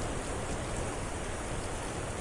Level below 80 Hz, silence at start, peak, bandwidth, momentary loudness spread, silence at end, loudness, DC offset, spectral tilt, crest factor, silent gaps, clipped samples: -42 dBFS; 0 s; -24 dBFS; 11.5 kHz; 1 LU; 0 s; -37 LUFS; under 0.1%; -4.5 dB/octave; 12 dB; none; under 0.1%